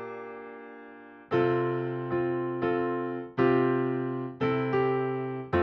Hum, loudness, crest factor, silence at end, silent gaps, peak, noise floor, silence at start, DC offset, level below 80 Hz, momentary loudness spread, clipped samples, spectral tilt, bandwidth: none; -28 LUFS; 18 dB; 0 s; none; -12 dBFS; -48 dBFS; 0 s; under 0.1%; -60 dBFS; 18 LU; under 0.1%; -9.5 dB/octave; 5.6 kHz